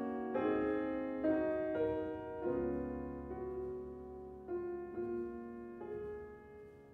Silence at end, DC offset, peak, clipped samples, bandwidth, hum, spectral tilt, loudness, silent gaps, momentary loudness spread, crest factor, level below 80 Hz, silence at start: 0 s; under 0.1%; -24 dBFS; under 0.1%; 4.5 kHz; none; -9.5 dB/octave; -40 LUFS; none; 14 LU; 16 dB; -60 dBFS; 0 s